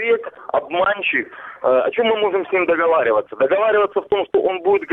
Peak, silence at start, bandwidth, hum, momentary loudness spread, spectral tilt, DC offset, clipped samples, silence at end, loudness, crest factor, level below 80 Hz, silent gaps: -4 dBFS; 0 s; 4 kHz; none; 6 LU; -7 dB/octave; under 0.1%; under 0.1%; 0 s; -18 LUFS; 14 dB; -60 dBFS; none